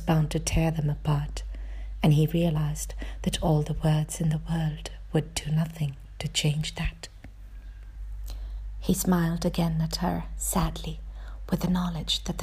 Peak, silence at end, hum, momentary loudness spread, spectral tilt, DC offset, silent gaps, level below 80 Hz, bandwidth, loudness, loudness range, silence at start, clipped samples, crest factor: -10 dBFS; 0 s; none; 16 LU; -5.5 dB/octave; under 0.1%; none; -36 dBFS; 15.5 kHz; -28 LUFS; 4 LU; 0 s; under 0.1%; 18 dB